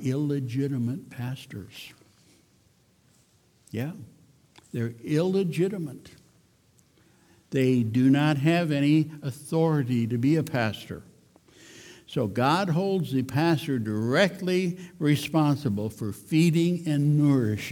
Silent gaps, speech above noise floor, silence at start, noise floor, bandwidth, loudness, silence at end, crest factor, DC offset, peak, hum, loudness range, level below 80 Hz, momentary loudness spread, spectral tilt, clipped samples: none; 38 dB; 0 s; -63 dBFS; 17.5 kHz; -26 LUFS; 0 s; 16 dB; under 0.1%; -10 dBFS; none; 12 LU; -66 dBFS; 16 LU; -7 dB/octave; under 0.1%